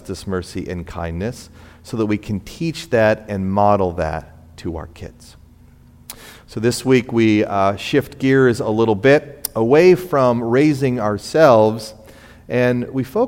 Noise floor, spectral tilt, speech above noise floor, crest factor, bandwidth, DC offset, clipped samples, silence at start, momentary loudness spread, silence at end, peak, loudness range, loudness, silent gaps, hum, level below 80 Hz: -46 dBFS; -6.5 dB/octave; 29 dB; 18 dB; 16.5 kHz; under 0.1%; under 0.1%; 0.05 s; 18 LU; 0 s; 0 dBFS; 8 LU; -17 LUFS; none; none; -44 dBFS